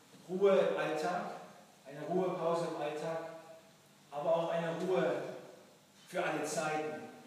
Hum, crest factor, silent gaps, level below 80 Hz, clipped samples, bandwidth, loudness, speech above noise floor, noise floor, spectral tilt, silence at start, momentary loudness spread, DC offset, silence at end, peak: none; 18 dB; none; under -90 dBFS; under 0.1%; 15 kHz; -35 LUFS; 28 dB; -62 dBFS; -5 dB/octave; 0.15 s; 20 LU; under 0.1%; 0 s; -18 dBFS